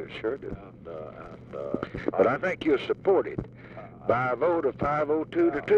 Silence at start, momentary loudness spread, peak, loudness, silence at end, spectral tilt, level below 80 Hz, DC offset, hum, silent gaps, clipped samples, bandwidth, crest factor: 0 s; 17 LU; -10 dBFS; -27 LUFS; 0 s; -8 dB/octave; -54 dBFS; under 0.1%; none; none; under 0.1%; 7 kHz; 18 dB